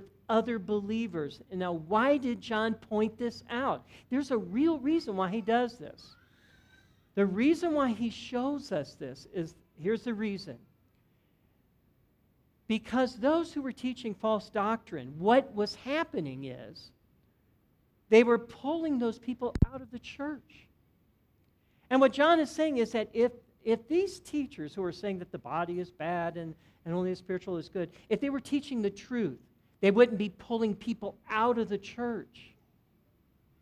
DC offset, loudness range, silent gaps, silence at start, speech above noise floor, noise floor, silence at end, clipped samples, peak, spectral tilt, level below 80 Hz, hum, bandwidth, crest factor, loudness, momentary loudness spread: under 0.1%; 6 LU; none; 0 s; 39 dB; -69 dBFS; 1.2 s; under 0.1%; -8 dBFS; -6.5 dB/octave; -54 dBFS; none; 12 kHz; 22 dB; -31 LUFS; 13 LU